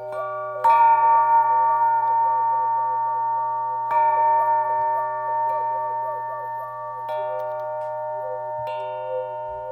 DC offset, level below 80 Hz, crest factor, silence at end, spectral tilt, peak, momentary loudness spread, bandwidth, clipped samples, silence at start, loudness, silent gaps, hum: under 0.1%; -68 dBFS; 14 dB; 0 s; -5.5 dB/octave; -8 dBFS; 13 LU; 4.3 kHz; under 0.1%; 0 s; -22 LUFS; none; none